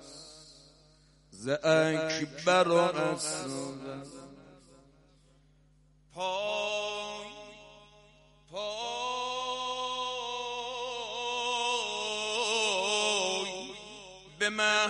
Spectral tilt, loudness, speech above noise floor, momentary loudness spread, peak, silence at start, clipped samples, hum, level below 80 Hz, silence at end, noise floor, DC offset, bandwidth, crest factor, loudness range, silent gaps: -2.5 dB/octave; -31 LUFS; 35 dB; 21 LU; -12 dBFS; 0 s; under 0.1%; 50 Hz at -65 dBFS; -66 dBFS; 0 s; -63 dBFS; under 0.1%; 11.5 kHz; 20 dB; 8 LU; none